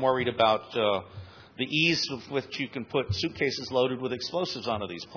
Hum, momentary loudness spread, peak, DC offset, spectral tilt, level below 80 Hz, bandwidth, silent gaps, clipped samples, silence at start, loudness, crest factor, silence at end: none; 10 LU; -10 dBFS; under 0.1%; -4.5 dB/octave; -60 dBFS; 5.4 kHz; none; under 0.1%; 0 s; -28 LUFS; 18 dB; 0 s